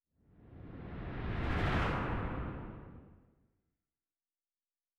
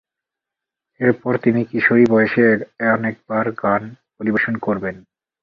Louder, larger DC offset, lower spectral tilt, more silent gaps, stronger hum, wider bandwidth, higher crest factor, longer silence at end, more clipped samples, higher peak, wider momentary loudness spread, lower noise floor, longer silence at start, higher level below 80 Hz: second, -38 LUFS vs -18 LUFS; neither; second, -7.5 dB/octave vs -9 dB/octave; neither; neither; first, 9.8 kHz vs 5.4 kHz; about the same, 18 dB vs 18 dB; first, 1.8 s vs 0.45 s; neither; second, -22 dBFS vs -2 dBFS; first, 21 LU vs 9 LU; first, under -90 dBFS vs -85 dBFS; second, 0.4 s vs 1 s; first, -46 dBFS vs -58 dBFS